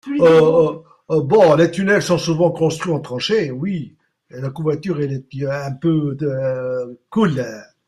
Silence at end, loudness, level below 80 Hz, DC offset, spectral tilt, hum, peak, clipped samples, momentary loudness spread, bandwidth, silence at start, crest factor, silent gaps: 0.25 s; -18 LUFS; -56 dBFS; under 0.1%; -6.5 dB/octave; none; -2 dBFS; under 0.1%; 13 LU; 12.5 kHz; 0.05 s; 16 dB; none